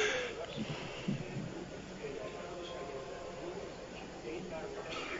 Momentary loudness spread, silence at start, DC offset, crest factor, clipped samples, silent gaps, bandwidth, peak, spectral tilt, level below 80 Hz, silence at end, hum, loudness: 6 LU; 0 s; under 0.1%; 22 dB; under 0.1%; none; 7.4 kHz; -20 dBFS; -3.5 dB/octave; -60 dBFS; 0 s; none; -42 LUFS